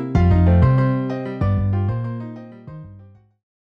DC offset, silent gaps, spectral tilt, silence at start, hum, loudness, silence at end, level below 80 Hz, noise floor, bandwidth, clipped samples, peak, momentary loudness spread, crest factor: under 0.1%; none; -10 dB/octave; 0 s; none; -19 LUFS; 0.75 s; -30 dBFS; -46 dBFS; 5.4 kHz; under 0.1%; -4 dBFS; 23 LU; 16 dB